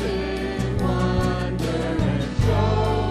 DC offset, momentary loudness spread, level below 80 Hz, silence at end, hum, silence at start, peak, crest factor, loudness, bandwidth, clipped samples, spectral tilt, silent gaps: under 0.1%; 5 LU; -30 dBFS; 0 s; none; 0 s; -8 dBFS; 14 dB; -23 LUFS; 13.5 kHz; under 0.1%; -7 dB/octave; none